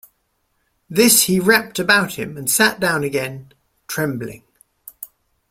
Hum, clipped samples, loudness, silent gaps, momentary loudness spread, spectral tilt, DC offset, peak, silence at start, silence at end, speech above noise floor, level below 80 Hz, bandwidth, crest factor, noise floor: none; under 0.1%; -16 LUFS; none; 23 LU; -3 dB/octave; under 0.1%; 0 dBFS; 0.9 s; 0.45 s; 50 dB; -56 dBFS; 16.5 kHz; 20 dB; -68 dBFS